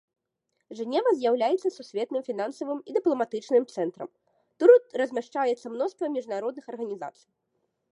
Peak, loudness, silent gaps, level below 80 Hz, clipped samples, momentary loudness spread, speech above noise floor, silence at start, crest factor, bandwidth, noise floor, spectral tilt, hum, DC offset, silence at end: -4 dBFS; -26 LUFS; none; -86 dBFS; under 0.1%; 15 LU; 51 dB; 0.7 s; 22 dB; 9.6 kHz; -80 dBFS; -5 dB/octave; none; under 0.1%; 0.85 s